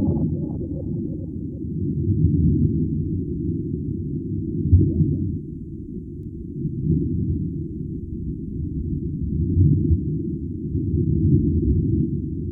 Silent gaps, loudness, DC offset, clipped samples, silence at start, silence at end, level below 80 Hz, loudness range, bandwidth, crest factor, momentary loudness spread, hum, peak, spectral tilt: none; -23 LUFS; under 0.1%; under 0.1%; 0 s; 0 s; -32 dBFS; 5 LU; 1 kHz; 18 dB; 12 LU; none; -4 dBFS; -16.5 dB/octave